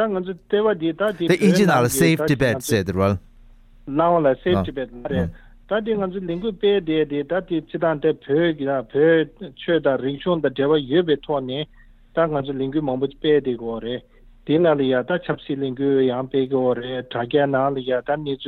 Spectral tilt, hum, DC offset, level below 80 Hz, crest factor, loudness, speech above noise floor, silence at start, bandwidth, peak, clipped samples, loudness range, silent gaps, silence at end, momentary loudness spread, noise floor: -6 dB/octave; none; under 0.1%; -48 dBFS; 16 dB; -21 LUFS; 27 dB; 0 s; 16 kHz; -4 dBFS; under 0.1%; 4 LU; none; 0 s; 10 LU; -47 dBFS